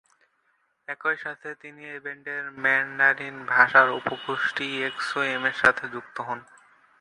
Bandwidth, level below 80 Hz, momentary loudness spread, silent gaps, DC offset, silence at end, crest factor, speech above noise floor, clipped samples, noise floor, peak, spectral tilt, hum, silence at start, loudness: 11.5 kHz; -66 dBFS; 18 LU; none; under 0.1%; 0.6 s; 24 dB; 45 dB; under 0.1%; -70 dBFS; -2 dBFS; -3.5 dB/octave; none; 0.9 s; -24 LUFS